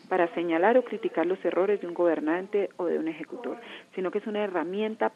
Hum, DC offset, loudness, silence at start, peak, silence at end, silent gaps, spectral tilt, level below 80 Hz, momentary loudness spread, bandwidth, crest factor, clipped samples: none; under 0.1%; -28 LUFS; 0.1 s; -10 dBFS; 0.05 s; none; -7 dB/octave; -90 dBFS; 13 LU; 7.4 kHz; 18 dB; under 0.1%